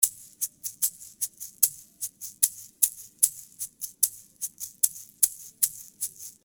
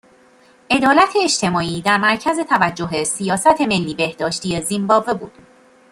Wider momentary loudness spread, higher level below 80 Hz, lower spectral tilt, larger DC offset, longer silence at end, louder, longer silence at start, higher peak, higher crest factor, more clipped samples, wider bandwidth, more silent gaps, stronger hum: first, 11 LU vs 8 LU; second, -72 dBFS vs -52 dBFS; second, 3 dB/octave vs -3.5 dB/octave; neither; second, 0.15 s vs 0.6 s; second, -27 LUFS vs -17 LUFS; second, 0 s vs 0.7 s; about the same, 0 dBFS vs -2 dBFS; first, 30 dB vs 16 dB; neither; first, over 20 kHz vs 16 kHz; neither; neither